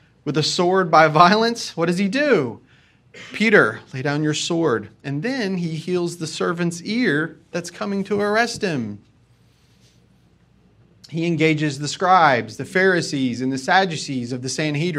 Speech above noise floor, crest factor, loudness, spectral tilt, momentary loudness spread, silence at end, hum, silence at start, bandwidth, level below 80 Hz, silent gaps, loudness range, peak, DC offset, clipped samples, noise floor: 36 dB; 20 dB; -20 LUFS; -5 dB/octave; 12 LU; 0 s; none; 0.25 s; 13.5 kHz; -62 dBFS; none; 8 LU; 0 dBFS; under 0.1%; under 0.1%; -56 dBFS